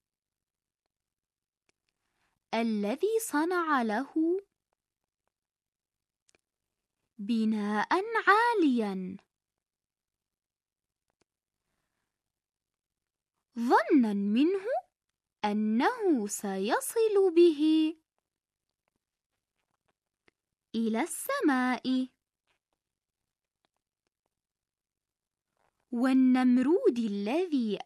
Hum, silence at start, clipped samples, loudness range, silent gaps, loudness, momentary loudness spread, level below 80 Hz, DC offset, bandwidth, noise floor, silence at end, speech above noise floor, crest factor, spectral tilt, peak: 50 Hz at -90 dBFS; 2.5 s; under 0.1%; 11 LU; 5.68-5.72 s, 6.22-6.26 s, 19.26-19.30 s, 24.19-24.23 s; -28 LUFS; 11 LU; -84 dBFS; under 0.1%; 13 kHz; under -90 dBFS; 0.05 s; over 63 dB; 22 dB; -5 dB/octave; -10 dBFS